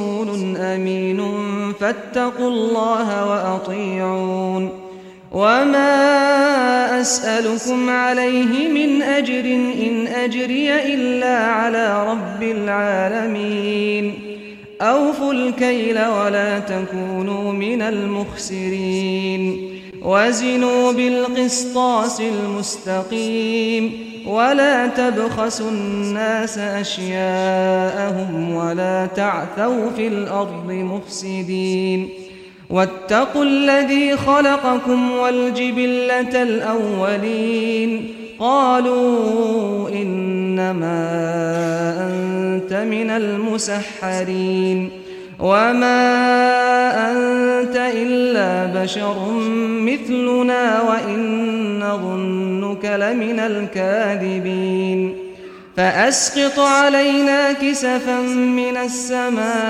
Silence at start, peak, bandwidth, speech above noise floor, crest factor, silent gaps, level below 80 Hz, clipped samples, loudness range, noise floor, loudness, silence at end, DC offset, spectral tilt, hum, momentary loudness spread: 0 s; -2 dBFS; 14 kHz; 21 dB; 16 dB; none; -58 dBFS; under 0.1%; 5 LU; -38 dBFS; -18 LUFS; 0 s; under 0.1%; -4.5 dB/octave; none; 8 LU